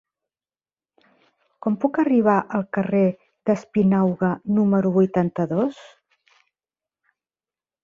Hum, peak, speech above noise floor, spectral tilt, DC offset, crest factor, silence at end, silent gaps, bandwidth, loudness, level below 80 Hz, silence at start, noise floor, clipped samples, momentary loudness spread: none; -4 dBFS; over 70 dB; -9.5 dB/octave; under 0.1%; 18 dB; 2 s; none; 7.2 kHz; -21 LUFS; -62 dBFS; 1.65 s; under -90 dBFS; under 0.1%; 7 LU